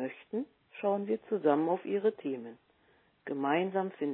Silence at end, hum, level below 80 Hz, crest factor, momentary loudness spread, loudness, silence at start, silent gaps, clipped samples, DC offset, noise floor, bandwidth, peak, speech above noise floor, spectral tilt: 0 s; none; -86 dBFS; 18 dB; 12 LU; -33 LUFS; 0 s; none; under 0.1%; under 0.1%; -68 dBFS; 4.1 kHz; -14 dBFS; 36 dB; -5.5 dB/octave